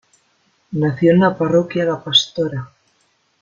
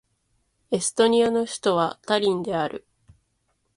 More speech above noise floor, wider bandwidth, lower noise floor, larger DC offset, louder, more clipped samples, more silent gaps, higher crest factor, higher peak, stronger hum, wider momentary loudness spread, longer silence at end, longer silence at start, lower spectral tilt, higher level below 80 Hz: about the same, 46 dB vs 49 dB; second, 7.6 kHz vs 11.5 kHz; second, -62 dBFS vs -72 dBFS; neither; first, -16 LUFS vs -23 LUFS; neither; neither; about the same, 18 dB vs 18 dB; first, -2 dBFS vs -6 dBFS; neither; about the same, 10 LU vs 10 LU; second, 0.75 s vs 1 s; about the same, 0.7 s vs 0.7 s; first, -5.5 dB/octave vs -4 dB/octave; first, -58 dBFS vs -64 dBFS